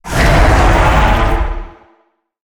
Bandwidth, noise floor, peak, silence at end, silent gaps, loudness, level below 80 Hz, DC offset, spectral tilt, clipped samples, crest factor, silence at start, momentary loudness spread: over 20 kHz; -58 dBFS; 0 dBFS; 0.75 s; none; -12 LUFS; -14 dBFS; under 0.1%; -5.5 dB/octave; under 0.1%; 12 dB; 0.05 s; 11 LU